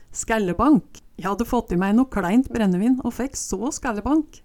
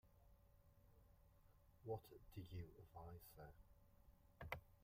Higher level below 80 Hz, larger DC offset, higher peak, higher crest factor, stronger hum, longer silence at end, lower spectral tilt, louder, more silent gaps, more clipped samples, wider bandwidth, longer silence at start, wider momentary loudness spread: first, -40 dBFS vs -70 dBFS; neither; first, -4 dBFS vs -32 dBFS; second, 16 dB vs 26 dB; neither; about the same, 0.1 s vs 0 s; about the same, -5.5 dB/octave vs -6.5 dB/octave; first, -22 LUFS vs -58 LUFS; neither; neither; about the same, 17.5 kHz vs 16 kHz; about the same, 0 s vs 0.05 s; about the same, 8 LU vs 9 LU